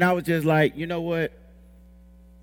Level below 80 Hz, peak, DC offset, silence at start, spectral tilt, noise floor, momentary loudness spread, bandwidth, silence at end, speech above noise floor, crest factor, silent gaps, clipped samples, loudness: -52 dBFS; -6 dBFS; under 0.1%; 0 s; -7 dB/octave; -50 dBFS; 8 LU; 18 kHz; 1.15 s; 27 dB; 18 dB; none; under 0.1%; -24 LUFS